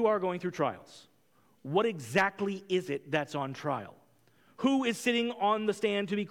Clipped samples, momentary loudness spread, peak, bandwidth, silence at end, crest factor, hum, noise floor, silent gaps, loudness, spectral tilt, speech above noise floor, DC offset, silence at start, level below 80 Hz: under 0.1%; 7 LU; -14 dBFS; 17 kHz; 0.05 s; 18 dB; none; -68 dBFS; none; -31 LUFS; -5 dB/octave; 38 dB; under 0.1%; 0 s; -76 dBFS